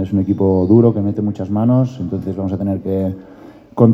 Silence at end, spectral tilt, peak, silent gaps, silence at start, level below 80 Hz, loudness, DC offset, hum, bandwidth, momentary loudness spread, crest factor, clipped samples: 0 s; -11.5 dB/octave; 0 dBFS; none; 0 s; -50 dBFS; -16 LUFS; under 0.1%; none; 6.4 kHz; 11 LU; 16 dB; under 0.1%